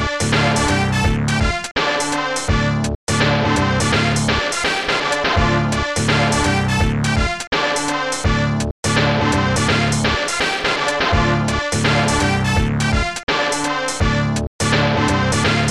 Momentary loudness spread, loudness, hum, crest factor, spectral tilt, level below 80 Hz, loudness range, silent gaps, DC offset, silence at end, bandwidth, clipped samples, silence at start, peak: 4 LU; -17 LUFS; none; 14 dB; -4.5 dB/octave; -28 dBFS; 1 LU; 1.71-1.75 s, 2.95-3.07 s, 7.47-7.51 s, 8.71-8.83 s, 13.23-13.27 s, 14.47-14.59 s; 0.5%; 0 s; 13.5 kHz; under 0.1%; 0 s; -4 dBFS